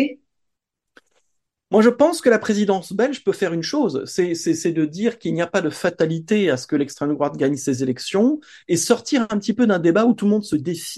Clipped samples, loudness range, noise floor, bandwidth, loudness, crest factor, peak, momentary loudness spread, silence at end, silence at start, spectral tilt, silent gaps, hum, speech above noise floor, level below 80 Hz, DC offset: under 0.1%; 2 LU; -79 dBFS; 12.5 kHz; -20 LUFS; 18 dB; -2 dBFS; 7 LU; 0 s; 0 s; -5 dB/octave; none; none; 60 dB; -64 dBFS; under 0.1%